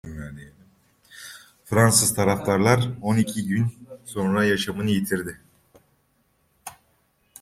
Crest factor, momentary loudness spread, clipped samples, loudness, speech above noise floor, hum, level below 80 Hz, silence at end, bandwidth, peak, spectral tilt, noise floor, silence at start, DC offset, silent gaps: 22 dB; 24 LU; under 0.1%; -22 LUFS; 45 dB; none; -54 dBFS; 0.7 s; 16 kHz; -2 dBFS; -4.5 dB/octave; -67 dBFS; 0.05 s; under 0.1%; none